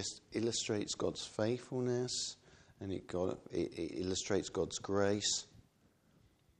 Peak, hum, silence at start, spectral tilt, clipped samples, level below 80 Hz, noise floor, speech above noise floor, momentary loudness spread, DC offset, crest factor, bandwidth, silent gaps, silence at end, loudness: -20 dBFS; none; 0 s; -4 dB/octave; under 0.1%; -68 dBFS; -71 dBFS; 33 dB; 8 LU; under 0.1%; 20 dB; 10.5 kHz; none; 1 s; -38 LUFS